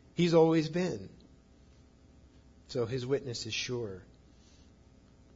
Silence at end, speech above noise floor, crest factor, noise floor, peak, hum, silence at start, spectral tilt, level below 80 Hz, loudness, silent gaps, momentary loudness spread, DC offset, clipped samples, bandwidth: 1.35 s; 29 dB; 22 dB; -60 dBFS; -12 dBFS; none; 0.15 s; -6 dB/octave; -62 dBFS; -31 LUFS; none; 18 LU; under 0.1%; under 0.1%; 7.8 kHz